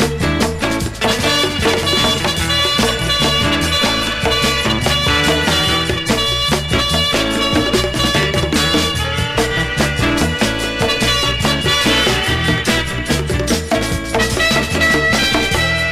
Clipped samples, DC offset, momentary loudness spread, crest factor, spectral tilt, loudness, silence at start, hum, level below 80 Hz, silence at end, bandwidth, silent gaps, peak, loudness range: under 0.1%; under 0.1%; 4 LU; 14 dB; -3.5 dB/octave; -14 LUFS; 0 s; none; -28 dBFS; 0 s; 15.5 kHz; none; -2 dBFS; 1 LU